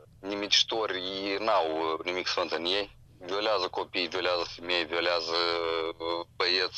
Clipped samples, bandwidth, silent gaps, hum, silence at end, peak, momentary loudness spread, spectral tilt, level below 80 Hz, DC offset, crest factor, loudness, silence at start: under 0.1%; 10 kHz; none; none; 0 s; -8 dBFS; 9 LU; -2 dB/octave; -62 dBFS; under 0.1%; 20 dB; -29 LUFS; 0 s